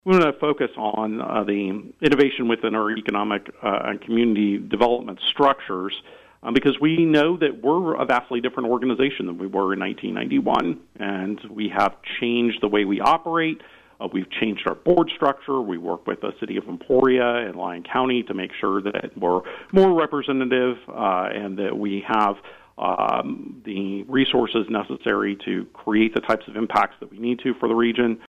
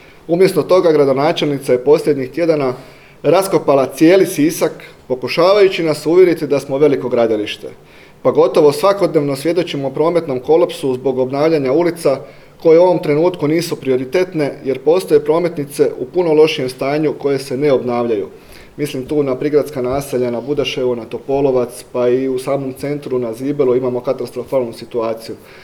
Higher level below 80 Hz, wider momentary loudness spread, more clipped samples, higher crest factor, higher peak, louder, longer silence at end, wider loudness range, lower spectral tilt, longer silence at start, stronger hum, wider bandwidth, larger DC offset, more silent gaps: second, -56 dBFS vs -50 dBFS; about the same, 10 LU vs 10 LU; neither; about the same, 16 dB vs 14 dB; second, -6 dBFS vs 0 dBFS; second, -22 LUFS vs -15 LUFS; about the same, 0 s vs 0.05 s; about the same, 3 LU vs 4 LU; about the same, -7 dB/octave vs -6 dB/octave; second, 0.05 s vs 0.3 s; neither; second, 8.6 kHz vs 18.5 kHz; neither; neither